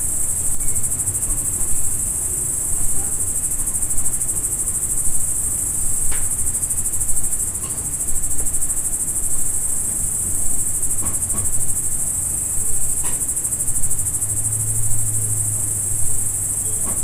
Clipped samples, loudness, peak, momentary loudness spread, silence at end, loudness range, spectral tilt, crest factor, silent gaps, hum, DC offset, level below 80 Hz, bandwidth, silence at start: under 0.1%; -19 LUFS; -2 dBFS; 1 LU; 0 s; 1 LU; -2.5 dB/octave; 14 dB; none; none; under 0.1%; -30 dBFS; 16 kHz; 0 s